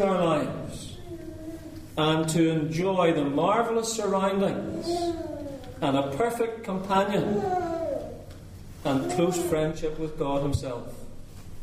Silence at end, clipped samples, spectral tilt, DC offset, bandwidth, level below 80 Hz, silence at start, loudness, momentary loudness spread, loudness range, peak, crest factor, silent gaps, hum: 0 s; under 0.1%; -5.5 dB/octave; under 0.1%; 15.5 kHz; -46 dBFS; 0 s; -27 LUFS; 17 LU; 4 LU; -8 dBFS; 18 dB; none; none